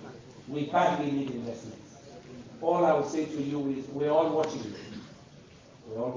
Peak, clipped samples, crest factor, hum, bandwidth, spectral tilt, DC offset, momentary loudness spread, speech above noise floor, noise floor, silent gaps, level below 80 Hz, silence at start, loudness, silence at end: -12 dBFS; under 0.1%; 18 dB; none; 7.6 kHz; -6.5 dB/octave; under 0.1%; 22 LU; 24 dB; -53 dBFS; none; -66 dBFS; 0 s; -29 LUFS; 0 s